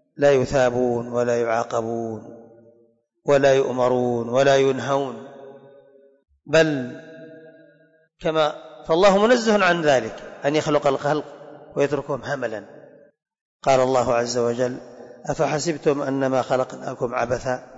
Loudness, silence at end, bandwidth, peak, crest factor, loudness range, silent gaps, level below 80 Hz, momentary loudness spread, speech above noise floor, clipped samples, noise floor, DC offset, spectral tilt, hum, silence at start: -21 LUFS; 0 s; 8 kHz; -8 dBFS; 14 dB; 5 LU; 13.41-13.59 s; -54 dBFS; 16 LU; 40 dB; under 0.1%; -60 dBFS; under 0.1%; -5 dB/octave; none; 0.2 s